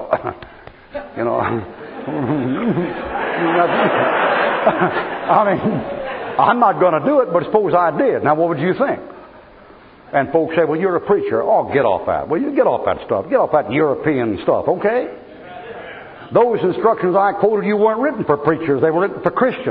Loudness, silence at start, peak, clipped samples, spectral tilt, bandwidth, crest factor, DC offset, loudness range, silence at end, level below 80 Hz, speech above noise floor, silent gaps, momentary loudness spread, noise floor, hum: -17 LUFS; 0 s; 0 dBFS; under 0.1%; -5 dB/octave; 5 kHz; 16 dB; under 0.1%; 3 LU; 0 s; -52 dBFS; 26 dB; none; 12 LU; -43 dBFS; none